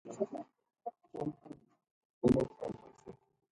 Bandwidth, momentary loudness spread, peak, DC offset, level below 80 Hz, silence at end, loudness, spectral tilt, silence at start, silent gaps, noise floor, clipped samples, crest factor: 11 kHz; 25 LU; -14 dBFS; under 0.1%; -62 dBFS; 0.4 s; -37 LUFS; -8.5 dB/octave; 0.05 s; 1.91-2.21 s; -57 dBFS; under 0.1%; 24 dB